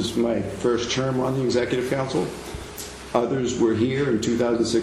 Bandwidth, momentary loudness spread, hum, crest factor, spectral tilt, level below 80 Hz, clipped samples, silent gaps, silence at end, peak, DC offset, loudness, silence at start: 15 kHz; 11 LU; none; 18 dB; -5.5 dB/octave; -48 dBFS; under 0.1%; none; 0 s; -6 dBFS; under 0.1%; -23 LUFS; 0 s